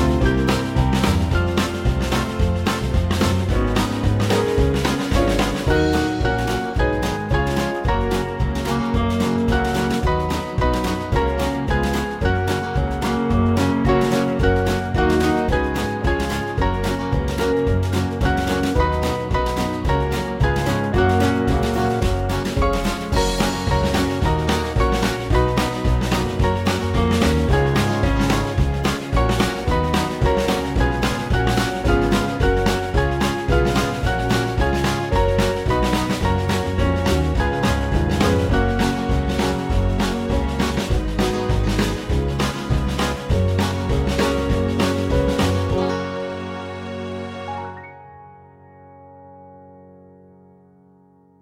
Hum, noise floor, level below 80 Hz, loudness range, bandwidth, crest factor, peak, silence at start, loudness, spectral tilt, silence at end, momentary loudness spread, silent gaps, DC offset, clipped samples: none; -53 dBFS; -26 dBFS; 2 LU; 16.5 kHz; 16 dB; -4 dBFS; 0 s; -20 LUFS; -6 dB/octave; 1.6 s; 4 LU; none; under 0.1%; under 0.1%